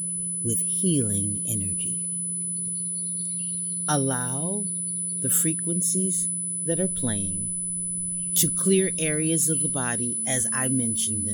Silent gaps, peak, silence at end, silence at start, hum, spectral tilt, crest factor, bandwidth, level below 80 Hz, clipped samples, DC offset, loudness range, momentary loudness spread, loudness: none; -6 dBFS; 0 s; 0 s; none; -3.5 dB/octave; 20 dB; 19 kHz; -58 dBFS; under 0.1%; under 0.1%; 3 LU; 6 LU; -24 LUFS